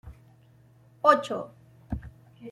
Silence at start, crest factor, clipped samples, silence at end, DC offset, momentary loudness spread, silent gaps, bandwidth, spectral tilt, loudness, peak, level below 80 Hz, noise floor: 0.05 s; 26 dB; under 0.1%; 0 s; under 0.1%; 21 LU; none; 12.5 kHz; -5.5 dB/octave; -26 LUFS; -4 dBFS; -50 dBFS; -57 dBFS